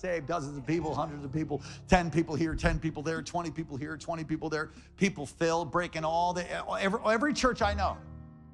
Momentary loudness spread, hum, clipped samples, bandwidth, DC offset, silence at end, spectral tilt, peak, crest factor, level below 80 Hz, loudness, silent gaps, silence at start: 10 LU; none; under 0.1%; 11.5 kHz; under 0.1%; 0 s; -5.5 dB/octave; -10 dBFS; 22 dB; -46 dBFS; -31 LUFS; none; 0 s